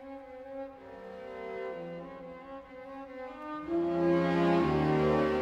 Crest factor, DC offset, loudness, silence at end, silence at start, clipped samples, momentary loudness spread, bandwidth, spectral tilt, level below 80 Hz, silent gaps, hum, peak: 16 dB; under 0.1%; -30 LUFS; 0 s; 0 s; under 0.1%; 19 LU; 8 kHz; -8 dB/octave; -56 dBFS; none; none; -16 dBFS